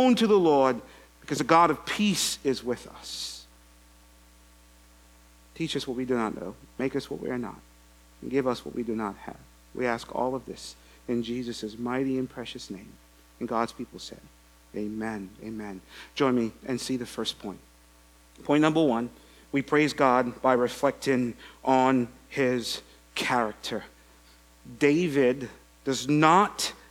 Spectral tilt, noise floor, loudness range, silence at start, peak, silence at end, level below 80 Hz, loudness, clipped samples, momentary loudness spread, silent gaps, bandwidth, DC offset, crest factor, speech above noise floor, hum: -4.5 dB/octave; -56 dBFS; 10 LU; 0 s; -4 dBFS; 0.15 s; -58 dBFS; -27 LUFS; under 0.1%; 18 LU; none; 19 kHz; under 0.1%; 24 dB; 30 dB; none